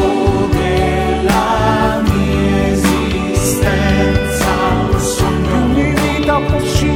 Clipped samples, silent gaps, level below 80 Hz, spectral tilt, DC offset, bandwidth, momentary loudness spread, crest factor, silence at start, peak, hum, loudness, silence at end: under 0.1%; none; -22 dBFS; -5.5 dB/octave; under 0.1%; 18.5 kHz; 2 LU; 14 dB; 0 s; 0 dBFS; none; -14 LUFS; 0 s